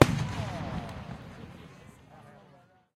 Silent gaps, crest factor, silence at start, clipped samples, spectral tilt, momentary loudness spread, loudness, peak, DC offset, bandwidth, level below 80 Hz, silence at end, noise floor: none; 30 dB; 0 s; under 0.1%; -6 dB/octave; 20 LU; -33 LUFS; -2 dBFS; under 0.1%; 15.5 kHz; -50 dBFS; 0.6 s; -60 dBFS